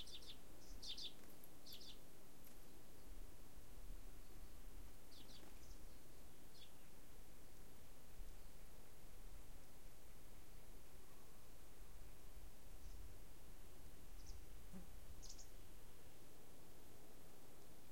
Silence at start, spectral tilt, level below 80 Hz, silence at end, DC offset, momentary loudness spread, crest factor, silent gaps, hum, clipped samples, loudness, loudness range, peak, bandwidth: 0 s; -3.5 dB/octave; -62 dBFS; 0 s; 0.4%; 7 LU; 20 dB; none; none; under 0.1%; -62 LUFS; 7 LU; -36 dBFS; 16.5 kHz